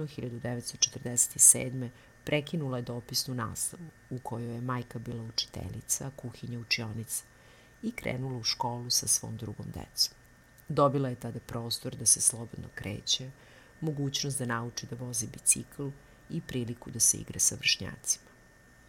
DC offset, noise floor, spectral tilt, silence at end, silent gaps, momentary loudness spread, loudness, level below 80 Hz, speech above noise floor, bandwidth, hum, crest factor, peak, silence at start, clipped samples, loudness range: under 0.1%; -58 dBFS; -2.5 dB/octave; 0.7 s; none; 16 LU; -29 LUFS; -60 dBFS; 26 dB; 19 kHz; none; 26 dB; -6 dBFS; 0 s; under 0.1%; 8 LU